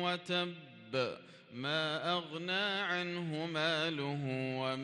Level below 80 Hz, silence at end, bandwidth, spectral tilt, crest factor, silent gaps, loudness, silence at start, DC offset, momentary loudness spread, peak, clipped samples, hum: -82 dBFS; 0 s; 11.5 kHz; -5 dB/octave; 16 dB; none; -36 LUFS; 0 s; under 0.1%; 8 LU; -20 dBFS; under 0.1%; none